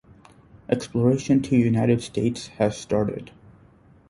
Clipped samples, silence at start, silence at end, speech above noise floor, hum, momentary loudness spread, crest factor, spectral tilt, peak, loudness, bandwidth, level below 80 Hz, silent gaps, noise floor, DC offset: under 0.1%; 0.7 s; 0.85 s; 31 dB; none; 8 LU; 20 dB; -7 dB/octave; -4 dBFS; -23 LUFS; 11.5 kHz; -52 dBFS; none; -54 dBFS; under 0.1%